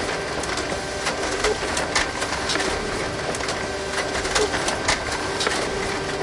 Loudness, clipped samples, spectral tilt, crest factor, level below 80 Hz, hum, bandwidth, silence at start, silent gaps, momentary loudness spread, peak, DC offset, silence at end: -23 LUFS; under 0.1%; -2.5 dB/octave; 18 dB; -40 dBFS; none; 11.5 kHz; 0 s; none; 4 LU; -6 dBFS; under 0.1%; 0 s